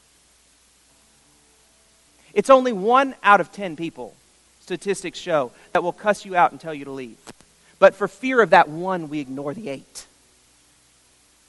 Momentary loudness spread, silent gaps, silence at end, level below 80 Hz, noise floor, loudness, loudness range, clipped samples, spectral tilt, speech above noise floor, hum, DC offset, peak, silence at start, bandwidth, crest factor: 19 LU; none; 1.45 s; -64 dBFS; -58 dBFS; -20 LUFS; 4 LU; under 0.1%; -4.5 dB/octave; 37 dB; none; under 0.1%; 0 dBFS; 2.35 s; 11.5 kHz; 22 dB